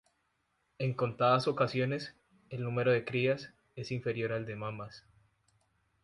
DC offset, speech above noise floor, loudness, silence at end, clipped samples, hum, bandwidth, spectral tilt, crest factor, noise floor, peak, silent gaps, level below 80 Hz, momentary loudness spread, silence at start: under 0.1%; 46 dB; -33 LUFS; 1.05 s; under 0.1%; none; 11.5 kHz; -7 dB/octave; 20 dB; -78 dBFS; -14 dBFS; none; -70 dBFS; 17 LU; 0.8 s